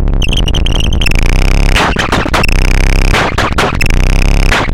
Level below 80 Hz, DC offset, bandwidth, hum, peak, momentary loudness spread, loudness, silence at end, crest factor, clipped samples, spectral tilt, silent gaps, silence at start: -10 dBFS; under 0.1%; 14.5 kHz; none; 0 dBFS; 2 LU; -11 LUFS; 0 s; 8 dB; under 0.1%; -4.5 dB/octave; none; 0 s